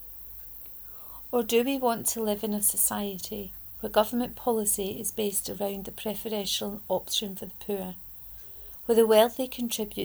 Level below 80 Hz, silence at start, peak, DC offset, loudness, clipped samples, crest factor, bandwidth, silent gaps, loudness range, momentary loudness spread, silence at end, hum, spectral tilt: -56 dBFS; 0 s; -8 dBFS; under 0.1%; -28 LUFS; under 0.1%; 20 dB; over 20 kHz; none; 4 LU; 15 LU; 0 s; none; -3 dB/octave